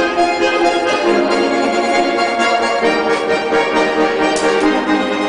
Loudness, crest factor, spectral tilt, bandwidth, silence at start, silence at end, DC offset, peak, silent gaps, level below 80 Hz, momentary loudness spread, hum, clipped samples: -14 LUFS; 12 dB; -3.5 dB/octave; 10.5 kHz; 0 s; 0 s; under 0.1%; -2 dBFS; none; -48 dBFS; 2 LU; none; under 0.1%